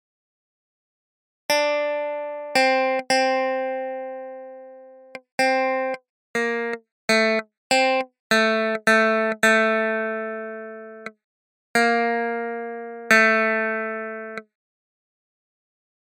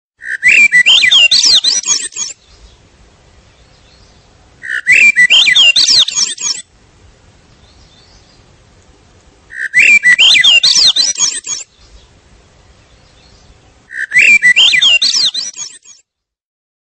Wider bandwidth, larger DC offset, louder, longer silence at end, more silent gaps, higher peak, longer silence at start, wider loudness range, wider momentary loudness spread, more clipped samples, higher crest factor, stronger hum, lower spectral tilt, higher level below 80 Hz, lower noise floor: about the same, 16 kHz vs 15.5 kHz; neither; second, -21 LUFS vs -6 LUFS; first, 1.65 s vs 1.15 s; first, 5.32-5.38 s, 6.09-6.34 s, 6.91-7.08 s, 7.57-7.70 s, 8.19-8.30 s, 11.24-11.74 s vs none; about the same, 0 dBFS vs 0 dBFS; first, 1.5 s vs 0.2 s; second, 5 LU vs 10 LU; about the same, 18 LU vs 18 LU; neither; first, 24 dB vs 12 dB; neither; first, -3 dB/octave vs 3 dB/octave; second, -80 dBFS vs -50 dBFS; second, -45 dBFS vs -58 dBFS